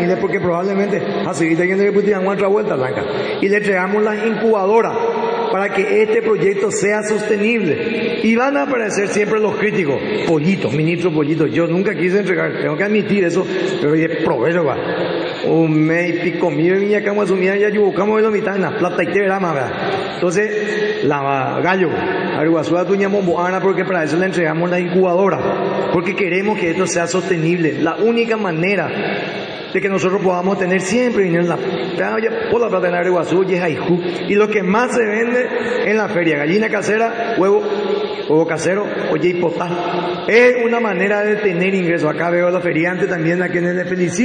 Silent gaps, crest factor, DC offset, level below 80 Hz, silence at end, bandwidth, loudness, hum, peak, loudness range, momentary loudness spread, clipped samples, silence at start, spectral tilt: none; 14 dB; under 0.1%; -58 dBFS; 0 s; 9.8 kHz; -16 LUFS; none; -2 dBFS; 2 LU; 4 LU; under 0.1%; 0 s; -6 dB/octave